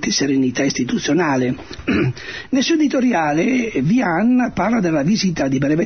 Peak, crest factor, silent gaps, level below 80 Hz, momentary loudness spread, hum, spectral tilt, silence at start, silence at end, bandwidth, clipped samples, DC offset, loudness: -6 dBFS; 10 dB; none; -46 dBFS; 5 LU; none; -5 dB/octave; 0 s; 0 s; 6.6 kHz; under 0.1%; 0.3%; -18 LUFS